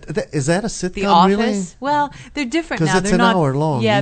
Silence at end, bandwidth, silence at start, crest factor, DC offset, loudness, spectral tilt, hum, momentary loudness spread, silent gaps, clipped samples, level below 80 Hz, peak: 0 s; 9.2 kHz; 0 s; 16 dB; under 0.1%; -17 LUFS; -5.5 dB/octave; none; 10 LU; none; under 0.1%; -40 dBFS; 0 dBFS